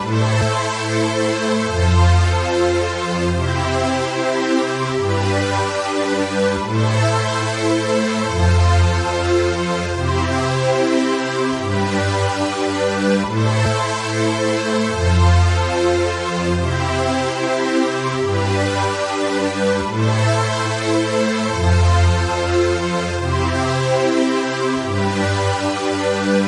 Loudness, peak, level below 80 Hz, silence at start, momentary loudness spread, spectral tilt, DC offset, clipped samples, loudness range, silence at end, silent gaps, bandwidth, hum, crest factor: -18 LUFS; -2 dBFS; -38 dBFS; 0 s; 4 LU; -5.5 dB/octave; under 0.1%; under 0.1%; 2 LU; 0 s; none; 11 kHz; none; 16 dB